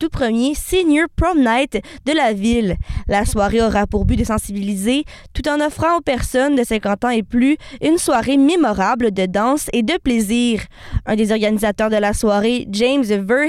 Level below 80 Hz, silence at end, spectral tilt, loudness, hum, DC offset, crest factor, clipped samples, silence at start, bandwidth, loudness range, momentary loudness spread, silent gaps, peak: -30 dBFS; 0 s; -5 dB/octave; -17 LUFS; none; under 0.1%; 10 dB; under 0.1%; 0 s; 15 kHz; 2 LU; 6 LU; none; -6 dBFS